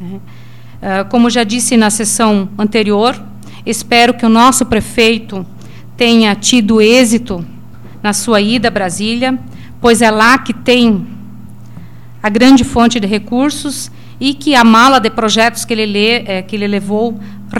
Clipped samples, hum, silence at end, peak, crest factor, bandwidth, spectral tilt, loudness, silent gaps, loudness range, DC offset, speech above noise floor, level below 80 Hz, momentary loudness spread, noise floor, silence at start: under 0.1%; none; 0 s; 0 dBFS; 12 dB; 16 kHz; -3.5 dB/octave; -11 LUFS; none; 3 LU; 3%; 23 dB; -40 dBFS; 15 LU; -34 dBFS; 0 s